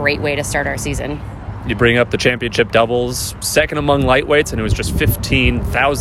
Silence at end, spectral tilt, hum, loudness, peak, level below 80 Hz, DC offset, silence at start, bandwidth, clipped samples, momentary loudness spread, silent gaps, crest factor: 0 s; -4.5 dB/octave; none; -16 LUFS; 0 dBFS; -28 dBFS; under 0.1%; 0 s; 16.5 kHz; under 0.1%; 9 LU; none; 16 dB